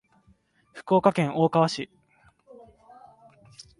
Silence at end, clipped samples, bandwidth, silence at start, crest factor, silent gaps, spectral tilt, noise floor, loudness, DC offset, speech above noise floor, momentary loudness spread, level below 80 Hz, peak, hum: 1.95 s; under 0.1%; 11.5 kHz; 0.75 s; 22 dB; none; -6.5 dB/octave; -63 dBFS; -23 LUFS; under 0.1%; 40 dB; 17 LU; -66 dBFS; -6 dBFS; none